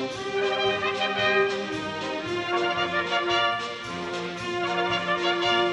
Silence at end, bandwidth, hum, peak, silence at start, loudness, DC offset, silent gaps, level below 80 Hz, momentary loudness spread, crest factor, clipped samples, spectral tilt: 0 s; 11 kHz; none; -10 dBFS; 0 s; -25 LUFS; under 0.1%; none; -60 dBFS; 8 LU; 16 dB; under 0.1%; -4 dB/octave